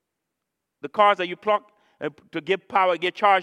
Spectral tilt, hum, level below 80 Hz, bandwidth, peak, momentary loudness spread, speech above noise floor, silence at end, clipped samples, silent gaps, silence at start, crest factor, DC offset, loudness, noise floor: -5 dB/octave; none; -76 dBFS; 10 kHz; -4 dBFS; 15 LU; 60 dB; 0 s; under 0.1%; none; 0.85 s; 20 dB; under 0.1%; -22 LUFS; -82 dBFS